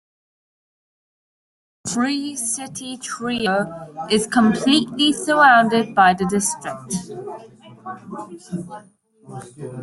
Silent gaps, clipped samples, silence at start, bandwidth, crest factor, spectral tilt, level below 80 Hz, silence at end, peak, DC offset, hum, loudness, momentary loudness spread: none; under 0.1%; 1.85 s; 12 kHz; 20 dB; -3.5 dB/octave; -60 dBFS; 0 s; -2 dBFS; under 0.1%; none; -18 LUFS; 21 LU